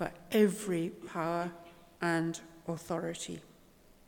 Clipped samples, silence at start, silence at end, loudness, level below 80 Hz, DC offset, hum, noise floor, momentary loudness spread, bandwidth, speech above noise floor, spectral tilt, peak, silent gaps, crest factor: under 0.1%; 0 s; 0.65 s; -34 LUFS; -66 dBFS; under 0.1%; none; -61 dBFS; 14 LU; 18.5 kHz; 27 dB; -5.5 dB/octave; -14 dBFS; none; 20 dB